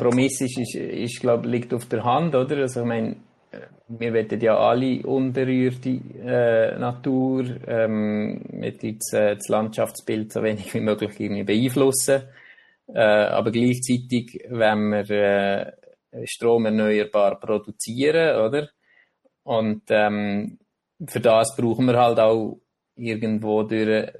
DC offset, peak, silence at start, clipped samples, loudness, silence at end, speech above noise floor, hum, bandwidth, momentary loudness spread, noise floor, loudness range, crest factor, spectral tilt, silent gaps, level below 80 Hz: under 0.1%; -4 dBFS; 0 s; under 0.1%; -22 LUFS; 0.1 s; 40 dB; none; 12.5 kHz; 11 LU; -62 dBFS; 3 LU; 18 dB; -5.5 dB/octave; none; -64 dBFS